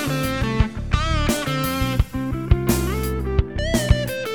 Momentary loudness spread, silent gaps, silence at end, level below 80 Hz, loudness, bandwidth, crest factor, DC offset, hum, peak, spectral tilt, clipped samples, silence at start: 4 LU; none; 0 s; -26 dBFS; -22 LUFS; over 20 kHz; 20 dB; 0.5%; none; -2 dBFS; -5.5 dB/octave; under 0.1%; 0 s